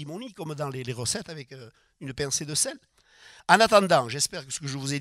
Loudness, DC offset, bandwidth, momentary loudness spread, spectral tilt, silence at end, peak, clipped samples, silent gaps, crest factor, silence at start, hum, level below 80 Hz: -25 LUFS; under 0.1%; 16 kHz; 21 LU; -3 dB/octave; 0 s; -2 dBFS; under 0.1%; none; 24 dB; 0 s; none; -60 dBFS